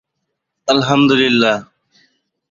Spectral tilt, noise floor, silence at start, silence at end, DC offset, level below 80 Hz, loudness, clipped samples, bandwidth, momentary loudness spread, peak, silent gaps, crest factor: -5 dB/octave; -75 dBFS; 0.65 s; 0.9 s; under 0.1%; -56 dBFS; -14 LUFS; under 0.1%; 7.4 kHz; 10 LU; -2 dBFS; none; 16 dB